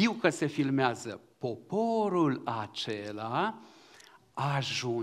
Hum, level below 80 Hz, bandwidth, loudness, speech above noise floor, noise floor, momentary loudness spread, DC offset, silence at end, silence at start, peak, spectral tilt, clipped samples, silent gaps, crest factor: none; -74 dBFS; 13.5 kHz; -31 LUFS; 27 dB; -57 dBFS; 11 LU; under 0.1%; 0 s; 0 s; -10 dBFS; -5.5 dB/octave; under 0.1%; none; 22 dB